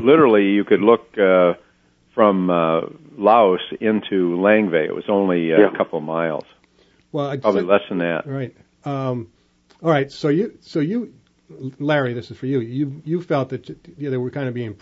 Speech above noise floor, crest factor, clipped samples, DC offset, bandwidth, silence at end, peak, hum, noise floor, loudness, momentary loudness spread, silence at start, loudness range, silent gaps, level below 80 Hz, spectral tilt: 39 dB; 18 dB; under 0.1%; under 0.1%; 7.6 kHz; 0.05 s; -2 dBFS; none; -58 dBFS; -19 LUFS; 14 LU; 0 s; 6 LU; none; -64 dBFS; -8 dB/octave